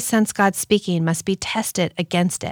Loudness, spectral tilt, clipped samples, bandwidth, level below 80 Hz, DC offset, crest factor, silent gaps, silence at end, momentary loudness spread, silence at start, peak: -20 LUFS; -4.5 dB/octave; under 0.1%; over 20 kHz; -56 dBFS; under 0.1%; 16 dB; none; 0 s; 5 LU; 0 s; -4 dBFS